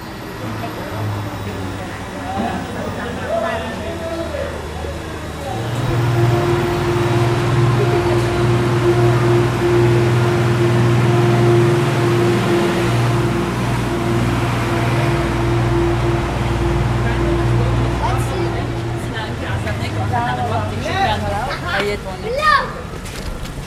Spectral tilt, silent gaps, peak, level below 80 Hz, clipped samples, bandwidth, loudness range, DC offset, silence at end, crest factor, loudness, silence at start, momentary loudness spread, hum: -6.5 dB/octave; none; -2 dBFS; -30 dBFS; under 0.1%; 15 kHz; 9 LU; under 0.1%; 0 s; 16 dB; -18 LUFS; 0 s; 11 LU; none